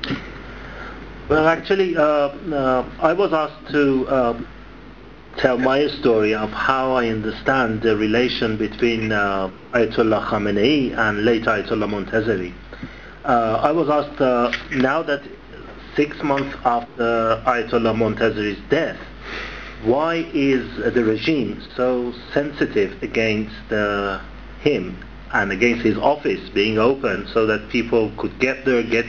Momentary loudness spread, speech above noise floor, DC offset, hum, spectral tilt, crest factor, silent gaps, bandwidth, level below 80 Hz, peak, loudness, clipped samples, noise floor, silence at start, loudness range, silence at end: 12 LU; 22 dB; 0.4%; none; -6.5 dB/octave; 20 dB; none; 7.2 kHz; -42 dBFS; 0 dBFS; -20 LUFS; under 0.1%; -41 dBFS; 0 s; 2 LU; 0 s